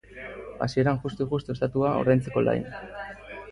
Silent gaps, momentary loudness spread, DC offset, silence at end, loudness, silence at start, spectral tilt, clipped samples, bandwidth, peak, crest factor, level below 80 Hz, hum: none; 16 LU; under 0.1%; 0 s; -26 LUFS; 0.1 s; -8 dB/octave; under 0.1%; 11 kHz; -8 dBFS; 18 dB; -52 dBFS; none